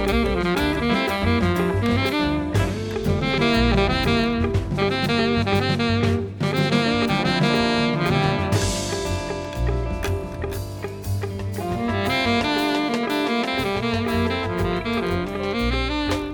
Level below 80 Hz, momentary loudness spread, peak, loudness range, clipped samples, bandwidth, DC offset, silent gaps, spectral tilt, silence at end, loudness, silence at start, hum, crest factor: -34 dBFS; 7 LU; -6 dBFS; 4 LU; under 0.1%; 19.5 kHz; under 0.1%; none; -5.5 dB/octave; 0 s; -22 LUFS; 0 s; none; 16 dB